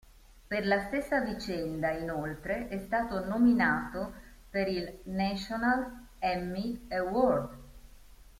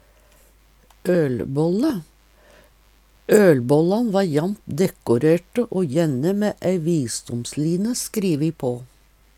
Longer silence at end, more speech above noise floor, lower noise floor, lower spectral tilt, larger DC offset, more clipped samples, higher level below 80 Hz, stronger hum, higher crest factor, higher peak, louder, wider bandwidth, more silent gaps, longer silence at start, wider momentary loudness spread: second, 0.15 s vs 0.5 s; second, 22 dB vs 35 dB; about the same, -53 dBFS vs -55 dBFS; about the same, -6.5 dB/octave vs -6.5 dB/octave; neither; neither; about the same, -52 dBFS vs -54 dBFS; neither; about the same, 18 dB vs 20 dB; second, -14 dBFS vs -2 dBFS; second, -31 LUFS vs -21 LUFS; about the same, 16 kHz vs 17 kHz; neither; second, 0.35 s vs 1.05 s; about the same, 10 LU vs 10 LU